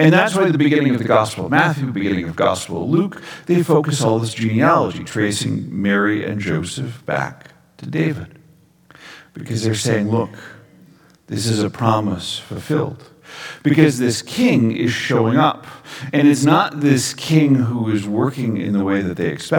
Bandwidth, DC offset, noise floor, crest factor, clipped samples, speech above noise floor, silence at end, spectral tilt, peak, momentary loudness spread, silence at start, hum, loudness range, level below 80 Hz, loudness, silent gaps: 18.5 kHz; under 0.1%; -51 dBFS; 18 dB; under 0.1%; 34 dB; 0 s; -5.5 dB/octave; 0 dBFS; 13 LU; 0 s; none; 7 LU; -56 dBFS; -18 LUFS; none